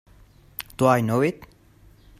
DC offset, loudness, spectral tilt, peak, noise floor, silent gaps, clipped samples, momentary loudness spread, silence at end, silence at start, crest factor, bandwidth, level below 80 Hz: under 0.1%; -22 LUFS; -6.5 dB/octave; -4 dBFS; -53 dBFS; none; under 0.1%; 19 LU; 0.75 s; 0.6 s; 22 dB; 16 kHz; -54 dBFS